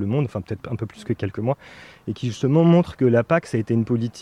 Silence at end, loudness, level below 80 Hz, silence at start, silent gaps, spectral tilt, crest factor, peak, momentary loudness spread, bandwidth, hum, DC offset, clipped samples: 0 s; -22 LUFS; -54 dBFS; 0 s; none; -8 dB/octave; 16 dB; -6 dBFS; 13 LU; 10.5 kHz; none; under 0.1%; under 0.1%